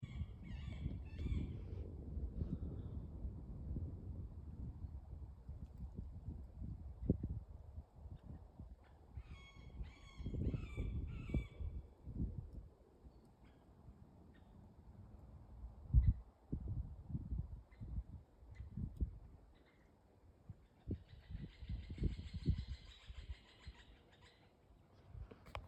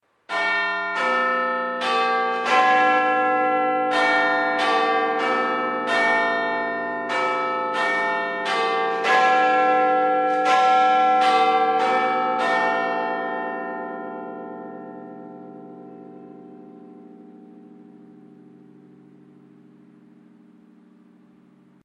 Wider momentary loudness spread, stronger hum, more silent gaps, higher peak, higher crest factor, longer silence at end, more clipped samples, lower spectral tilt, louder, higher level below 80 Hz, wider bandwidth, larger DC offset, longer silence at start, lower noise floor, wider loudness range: about the same, 20 LU vs 18 LU; neither; neither; second, -20 dBFS vs -6 dBFS; first, 28 dB vs 16 dB; second, 0 s vs 3.75 s; neither; first, -9 dB/octave vs -3.5 dB/octave; second, -48 LUFS vs -20 LUFS; first, -50 dBFS vs -84 dBFS; second, 8.2 kHz vs 10.5 kHz; neither; second, 0 s vs 0.3 s; first, -69 dBFS vs -54 dBFS; second, 9 LU vs 15 LU